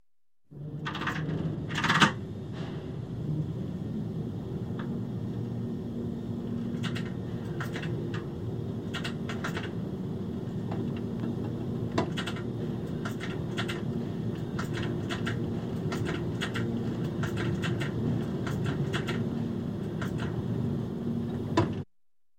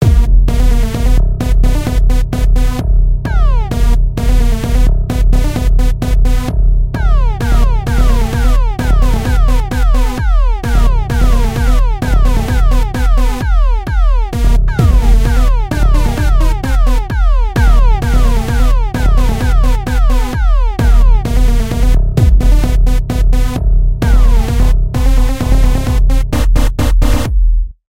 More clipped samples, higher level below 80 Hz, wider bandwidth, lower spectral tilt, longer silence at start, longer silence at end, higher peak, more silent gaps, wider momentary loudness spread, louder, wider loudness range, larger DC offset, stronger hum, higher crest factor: neither; second, -52 dBFS vs -10 dBFS; first, 16 kHz vs 13.5 kHz; about the same, -6 dB/octave vs -6.5 dB/octave; first, 0.5 s vs 0 s; first, 0.55 s vs 0.05 s; second, -6 dBFS vs 0 dBFS; neither; about the same, 5 LU vs 3 LU; second, -33 LUFS vs -14 LUFS; first, 4 LU vs 1 LU; second, under 0.1% vs 2%; neither; first, 26 dB vs 10 dB